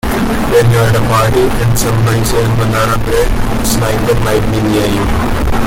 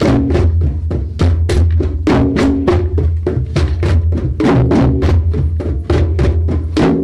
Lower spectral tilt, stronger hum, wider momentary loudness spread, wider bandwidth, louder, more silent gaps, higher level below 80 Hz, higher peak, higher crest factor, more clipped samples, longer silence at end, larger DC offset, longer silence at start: second, -5.5 dB/octave vs -8 dB/octave; neither; about the same, 4 LU vs 5 LU; first, 17 kHz vs 10 kHz; about the same, -12 LUFS vs -14 LUFS; neither; about the same, -20 dBFS vs -18 dBFS; about the same, 0 dBFS vs 0 dBFS; about the same, 10 dB vs 12 dB; neither; about the same, 0 s vs 0 s; neither; about the same, 0.05 s vs 0 s